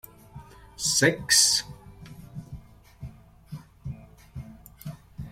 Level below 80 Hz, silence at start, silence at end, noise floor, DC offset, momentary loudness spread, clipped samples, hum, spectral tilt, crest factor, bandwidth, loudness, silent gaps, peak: -52 dBFS; 0.35 s; 0 s; -47 dBFS; under 0.1%; 28 LU; under 0.1%; none; -1.5 dB/octave; 24 dB; 16.5 kHz; -21 LUFS; none; -6 dBFS